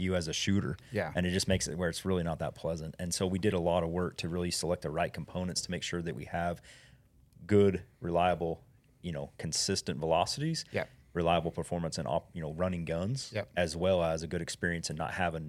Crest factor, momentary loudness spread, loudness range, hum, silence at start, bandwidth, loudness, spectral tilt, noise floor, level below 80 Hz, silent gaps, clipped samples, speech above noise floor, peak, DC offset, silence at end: 20 dB; 8 LU; 2 LU; none; 0 s; 15 kHz; -33 LUFS; -4.5 dB/octave; -61 dBFS; -54 dBFS; none; under 0.1%; 29 dB; -14 dBFS; under 0.1%; 0 s